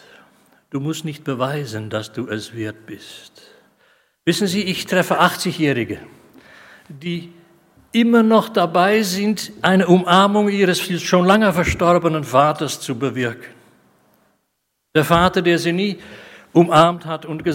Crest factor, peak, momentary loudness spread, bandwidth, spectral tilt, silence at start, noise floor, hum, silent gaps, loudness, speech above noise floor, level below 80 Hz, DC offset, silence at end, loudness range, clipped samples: 18 dB; 0 dBFS; 15 LU; 16.5 kHz; -5.5 dB/octave; 0.75 s; -72 dBFS; none; none; -17 LUFS; 55 dB; -48 dBFS; under 0.1%; 0 s; 11 LU; under 0.1%